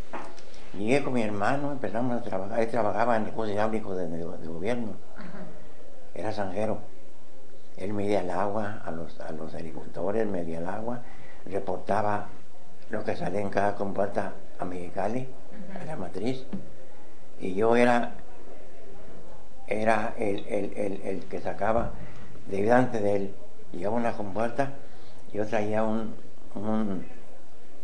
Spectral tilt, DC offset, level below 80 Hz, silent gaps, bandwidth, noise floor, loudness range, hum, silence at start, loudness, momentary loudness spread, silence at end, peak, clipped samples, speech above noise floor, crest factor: -7 dB/octave; 6%; -56 dBFS; none; 10 kHz; -54 dBFS; 6 LU; none; 0 s; -30 LUFS; 20 LU; 0 s; -8 dBFS; under 0.1%; 25 dB; 22 dB